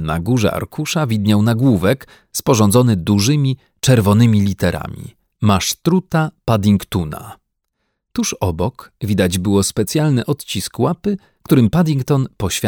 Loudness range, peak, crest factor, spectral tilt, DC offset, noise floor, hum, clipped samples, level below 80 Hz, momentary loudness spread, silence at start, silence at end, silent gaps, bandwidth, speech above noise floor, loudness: 5 LU; -2 dBFS; 16 dB; -5.5 dB/octave; under 0.1%; -72 dBFS; none; under 0.1%; -42 dBFS; 10 LU; 0 s; 0 s; none; 18.5 kHz; 56 dB; -16 LUFS